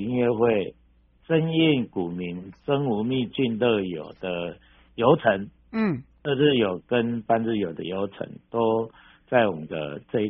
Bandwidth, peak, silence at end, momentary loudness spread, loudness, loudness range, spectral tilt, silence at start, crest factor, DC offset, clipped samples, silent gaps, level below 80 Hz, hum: 4.3 kHz; -4 dBFS; 0 s; 12 LU; -25 LUFS; 2 LU; -5 dB/octave; 0 s; 20 dB; under 0.1%; under 0.1%; none; -58 dBFS; none